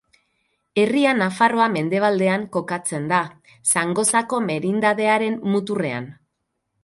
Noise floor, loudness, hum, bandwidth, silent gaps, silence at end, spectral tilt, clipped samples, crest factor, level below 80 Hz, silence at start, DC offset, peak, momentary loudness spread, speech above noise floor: -76 dBFS; -20 LUFS; none; 12 kHz; none; 0.7 s; -4 dB/octave; under 0.1%; 18 dB; -66 dBFS; 0.75 s; under 0.1%; -4 dBFS; 8 LU; 56 dB